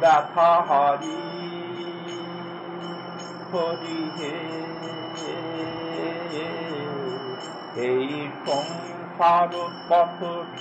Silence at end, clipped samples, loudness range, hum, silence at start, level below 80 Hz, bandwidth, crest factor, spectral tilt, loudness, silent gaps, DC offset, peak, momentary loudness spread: 0 s; under 0.1%; 7 LU; none; 0 s; -72 dBFS; 9 kHz; 18 dB; -5 dB/octave; -26 LUFS; none; under 0.1%; -6 dBFS; 15 LU